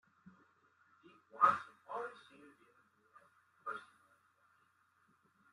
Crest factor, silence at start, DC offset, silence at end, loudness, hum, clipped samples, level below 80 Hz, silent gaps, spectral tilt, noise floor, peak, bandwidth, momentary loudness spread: 28 dB; 1.35 s; under 0.1%; 1.75 s; -37 LUFS; none; under 0.1%; under -90 dBFS; none; -4.5 dB/octave; -74 dBFS; -16 dBFS; 11.5 kHz; 22 LU